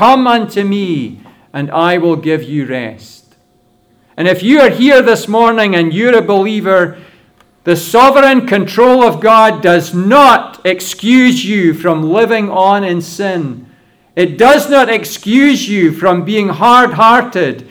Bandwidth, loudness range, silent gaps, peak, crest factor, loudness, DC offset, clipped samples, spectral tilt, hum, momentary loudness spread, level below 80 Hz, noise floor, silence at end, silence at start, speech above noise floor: over 20 kHz; 6 LU; none; 0 dBFS; 10 dB; -9 LUFS; under 0.1%; 0.4%; -5 dB/octave; none; 11 LU; -52 dBFS; -52 dBFS; 0.1 s; 0 s; 43 dB